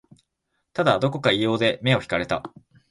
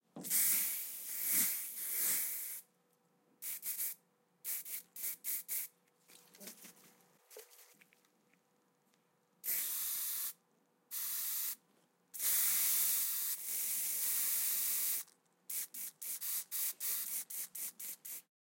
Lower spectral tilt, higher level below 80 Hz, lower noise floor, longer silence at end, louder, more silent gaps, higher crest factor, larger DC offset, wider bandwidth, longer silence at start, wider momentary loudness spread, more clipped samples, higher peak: first, -6 dB/octave vs 1.5 dB/octave; first, -54 dBFS vs under -90 dBFS; about the same, -76 dBFS vs -76 dBFS; about the same, 0.4 s vs 0.4 s; first, -22 LUFS vs -35 LUFS; neither; about the same, 22 dB vs 22 dB; neither; second, 11.5 kHz vs 16.5 kHz; first, 0.75 s vs 0.15 s; second, 9 LU vs 17 LU; neither; first, -2 dBFS vs -18 dBFS